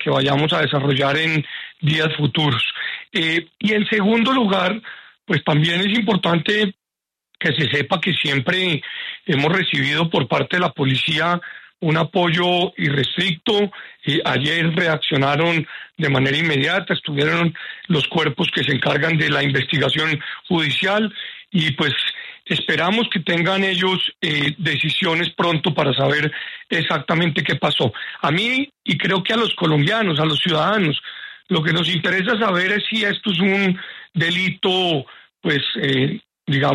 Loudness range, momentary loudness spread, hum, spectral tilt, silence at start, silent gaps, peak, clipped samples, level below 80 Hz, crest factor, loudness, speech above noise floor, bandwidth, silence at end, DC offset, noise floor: 1 LU; 6 LU; none; -6 dB/octave; 0 s; none; -4 dBFS; under 0.1%; -58 dBFS; 16 dB; -18 LUFS; 67 dB; 11.5 kHz; 0 s; under 0.1%; -86 dBFS